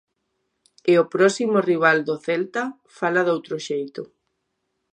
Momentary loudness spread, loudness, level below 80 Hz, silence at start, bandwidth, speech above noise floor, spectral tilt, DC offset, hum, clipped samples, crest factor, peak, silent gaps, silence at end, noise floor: 12 LU; -21 LUFS; -76 dBFS; 0.85 s; 10 kHz; 55 dB; -5 dB/octave; under 0.1%; none; under 0.1%; 20 dB; -2 dBFS; none; 0.9 s; -75 dBFS